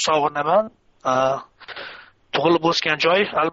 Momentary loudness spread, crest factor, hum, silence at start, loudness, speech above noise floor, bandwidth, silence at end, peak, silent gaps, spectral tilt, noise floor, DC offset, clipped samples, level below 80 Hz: 17 LU; 16 dB; none; 0 s; -20 LUFS; 22 dB; 7.6 kHz; 0 s; -6 dBFS; none; -2 dB/octave; -41 dBFS; under 0.1%; under 0.1%; -62 dBFS